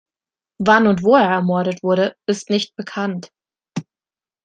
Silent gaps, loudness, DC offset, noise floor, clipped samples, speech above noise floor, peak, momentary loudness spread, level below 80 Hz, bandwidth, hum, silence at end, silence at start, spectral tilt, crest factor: none; -17 LUFS; under 0.1%; under -90 dBFS; under 0.1%; over 73 dB; -2 dBFS; 18 LU; -60 dBFS; 9.2 kHz; none; 0.6 s; 0.6 s; -6 dB/octave; 18 dB